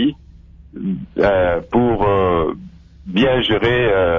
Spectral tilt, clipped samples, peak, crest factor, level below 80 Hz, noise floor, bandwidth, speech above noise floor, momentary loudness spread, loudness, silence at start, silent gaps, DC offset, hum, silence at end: -8 dB/octave; under 0.1%; -4 dBFS; 12 dB; -36 dBFS; -42 dBFS; 7 kHz; 26 dB; 10 LU; -17 LUFS; 0 s; none; under 0.1%; none; 0 s